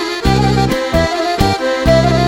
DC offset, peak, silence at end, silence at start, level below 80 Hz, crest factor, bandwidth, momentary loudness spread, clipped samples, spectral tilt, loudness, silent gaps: under 0.1%; 0 dBFS; 0 s; 0 s; -24 dBFS; 12 dB; 16.5 kHz; 3 LU; under 0.1%; -6 dB/octave; -14 LUFS; none